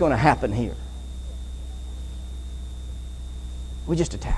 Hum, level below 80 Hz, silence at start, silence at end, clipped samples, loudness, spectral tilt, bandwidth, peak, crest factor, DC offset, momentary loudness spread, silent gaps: none; -32 dBFS; 0 s; 0 s; under 0.1%; -29 LUFS; -6.5 dB/octave; 12 kHz; -2 dBFS; 24 dB; under 0.1%; 16 LU; none